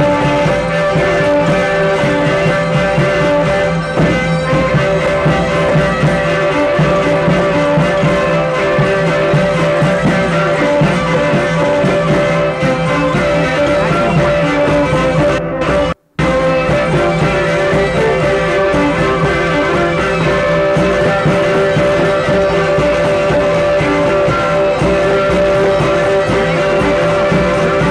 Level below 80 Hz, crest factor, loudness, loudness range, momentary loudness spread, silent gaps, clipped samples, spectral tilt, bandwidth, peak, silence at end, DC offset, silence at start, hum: -30 dBFS; 10 dB; -12 LUFS; 1 LU; 1 LU; none; under 0.1%; -6.5 dB/octave; 11 kHz; -2 dBFS; 0 s; under 0.1%; 0 s; none